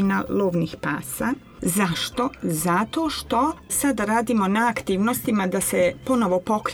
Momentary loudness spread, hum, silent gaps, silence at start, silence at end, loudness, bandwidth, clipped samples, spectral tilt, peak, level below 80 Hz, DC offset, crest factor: 5 LU; none; none; 0 s; 0 s; -23 LUFS; over 20 kHz; under 0.1%; -4.5 dB/octave; -8 dBFS; -48 dBFS; under 0.1%; 14 dB